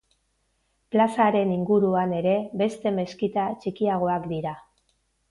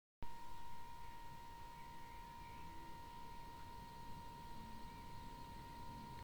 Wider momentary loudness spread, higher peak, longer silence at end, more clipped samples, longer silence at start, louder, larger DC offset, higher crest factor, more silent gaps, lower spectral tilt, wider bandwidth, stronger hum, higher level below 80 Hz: first, 8 LU vs 2 LU; first, -10 dBFS vs -36 dBFS; first, 0.7 s vs 0 s; neither; first, 0.9 s vs 0.2 s; first, -24 LUFS vs -56 LUFS; neither; about the same, 16 dB vs 16 dB; neither; first, -7.5 dB/octave vs -5 dB/octave; second, 11.5 kHz vs over 20 kHz; neither; about the same, -62 dBFS vs -60 dBFS